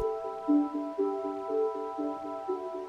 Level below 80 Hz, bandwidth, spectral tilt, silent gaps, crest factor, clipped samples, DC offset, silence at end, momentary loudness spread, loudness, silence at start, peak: -66 dBFS; 7.2 kHz; -7.5 dB/octave; none; 16 dB; under 0.1%; under 0.1%; 0 s; 7 LU; -32 LUFS; 0 s; -16 dBFS